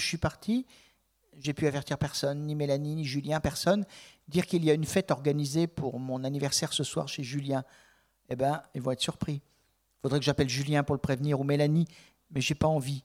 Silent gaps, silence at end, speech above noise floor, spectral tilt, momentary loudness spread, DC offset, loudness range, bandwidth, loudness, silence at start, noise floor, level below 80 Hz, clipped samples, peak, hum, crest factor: none; 0.05 s; 41 dB; -5.5 dB/octave; 9 LU; under 0.1%; 3 LU; 16 kHz; -30 LUFS; 0 s; -71 dBFS; -56 dBFS; under 0.1%; -10 dBFS; none; 20 dB